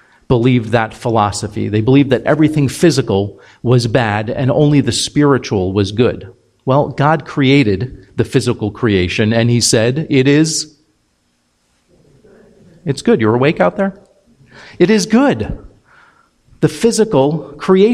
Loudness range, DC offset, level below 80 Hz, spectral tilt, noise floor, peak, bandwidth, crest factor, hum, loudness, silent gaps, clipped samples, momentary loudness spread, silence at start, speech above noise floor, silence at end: 4 LU; under 0.1%; -42 dBFS; -5.5 dB/octave; -61 dBFS; 0 dBFS; 15 kHz; 14 dB; none; -14 LUFS; none; under 0.1%; 9 LU; 0.3 s; 48 dB; 0 s